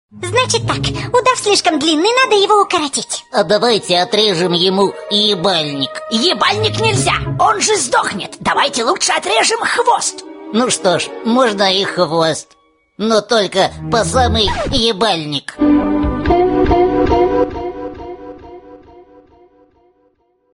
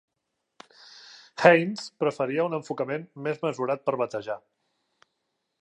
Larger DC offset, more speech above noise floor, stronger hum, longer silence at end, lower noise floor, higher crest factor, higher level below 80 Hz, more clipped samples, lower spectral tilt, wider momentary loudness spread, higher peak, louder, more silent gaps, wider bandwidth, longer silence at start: neither; second, 44 dB vs 55 dB; neither; first, 1.5 s vs 1.25 s; second, -58 dBFS vs -81 dBFS; second, 14 dB vs 26 dB; first, -34 dBFS vs -80 dBFS; neither; second, -3.5 dB/octave vs -6 dB/octave; second, 7 LU vs 21 LU; about the same, 0 dBFS vs -2 dBFS; first, -14 LUFS vs -26 LUFS; neither; first, 15.5 kHz vs 9.8 kHz; second, 0.15 s vs 0.95 s